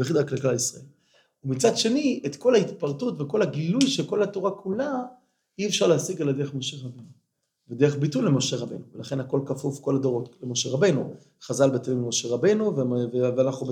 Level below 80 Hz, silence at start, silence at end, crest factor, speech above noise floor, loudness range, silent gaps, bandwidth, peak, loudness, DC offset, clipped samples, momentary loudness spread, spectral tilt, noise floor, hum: -74 dBFS; 0 s; 0 s; 18 dB; 39 dB; 3 LU; none; 16.5 kHz; -6 dBFS; -25 LUFS; under 0.1%; under 0.1%; 11 LU; -5 dB/octave; -64 dBFS; none